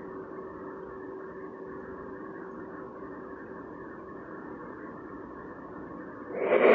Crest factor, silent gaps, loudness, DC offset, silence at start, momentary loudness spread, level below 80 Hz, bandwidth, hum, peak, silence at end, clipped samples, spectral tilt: 26 dB; none; -38 LUFS; under 0.1%; 0 s; 4 LU; -64 dBFS; 4.8 kHz; none; -8 dBFS; 0 s; under 0.1%; -4.5 dB/octave